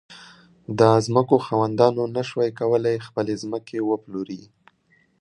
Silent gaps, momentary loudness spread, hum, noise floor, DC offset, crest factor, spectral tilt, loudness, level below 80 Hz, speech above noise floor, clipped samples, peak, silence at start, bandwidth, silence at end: none; 14 LU; none; -63 dBFS; under 0.1%; 22 dB; -7 dB/octave; -22 LUFS; -62 dBFS; 41 dB; under 0.1%; -2 dBFS; 0.1 s; 11 kHz; 0.75 s